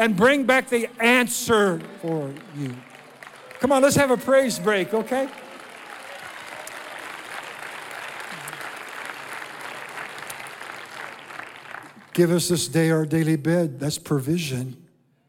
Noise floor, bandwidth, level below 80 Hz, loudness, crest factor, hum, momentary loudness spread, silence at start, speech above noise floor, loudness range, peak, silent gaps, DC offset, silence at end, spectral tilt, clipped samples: -44 dBFS; 17.5 kHz; -64 dBFS; -23 LUFS; 20 dB; none; 19 LU; 0 s; 23 dB; 12 LU; -4 dBFS; none; under 0.1%; 0.5 s; -4.5 dB/octave; under 0.1%